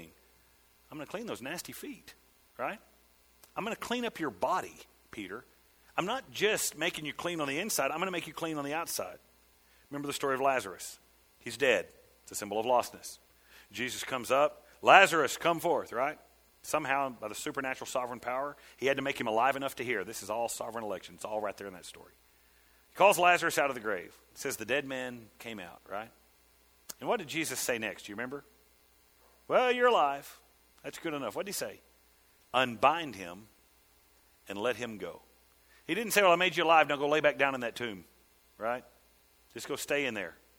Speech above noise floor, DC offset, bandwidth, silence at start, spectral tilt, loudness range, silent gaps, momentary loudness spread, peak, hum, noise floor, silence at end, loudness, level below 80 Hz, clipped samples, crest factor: 34 dB; under 0.1%; over 20 kHz; 0 s; -3 dB/octave; 10 LU; none; 20 LU; -4 dBFS; none; -65 dBFS; 0.25 s; -31 LUFS; -70 dBFS; under 0.1%; 30 dB